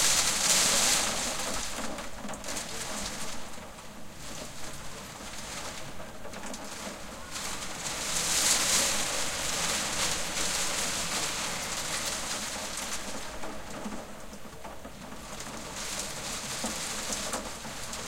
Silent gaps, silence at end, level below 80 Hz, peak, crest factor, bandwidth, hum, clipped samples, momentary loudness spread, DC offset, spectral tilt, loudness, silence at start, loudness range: none; 0 s; -50 dBFS; -10 dBFS; 22 dB; 16 kHz; none; under 0.1%; 19 LU; under 0.1%; -0.5 dB/octave; -30 LUFS; 0 s; 12 LU